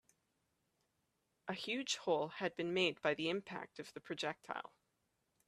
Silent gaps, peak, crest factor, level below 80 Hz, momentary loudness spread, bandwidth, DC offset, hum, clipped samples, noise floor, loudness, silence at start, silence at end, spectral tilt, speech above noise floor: none; -20 dBFS; 22 dB; -84 dBFS; 14 LU; 13.5 kHz; under 0.1%; none; under 0.1%; -84 dBFS; -40 LUFS; 1.45 s; 0.8 s; -3.5 dB/octave; 43 dB